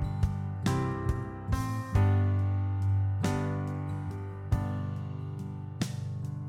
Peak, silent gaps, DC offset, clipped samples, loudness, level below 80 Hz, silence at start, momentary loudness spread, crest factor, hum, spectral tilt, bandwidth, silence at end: -14 dBFS; none; under 0.1%; under 0.1%; -32 LUFS; -42 dBFS; 0 s; 10 LU; 16 dB; 50 Hz at -45 dBFS; -7.5 dB/octave; 13 kHz; 0 s